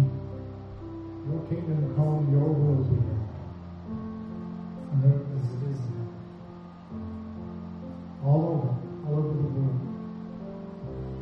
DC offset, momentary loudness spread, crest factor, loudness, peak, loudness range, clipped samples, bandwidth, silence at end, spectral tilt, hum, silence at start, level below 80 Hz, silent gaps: under 0.1%; 16 LU; 18 dB; -29 LUFS; -10 dBFS; 4 LU; under 0.1%; 4.7 kHz; 0 s; -11.5 dB/octave; none; 0 s; -50 dBFS; none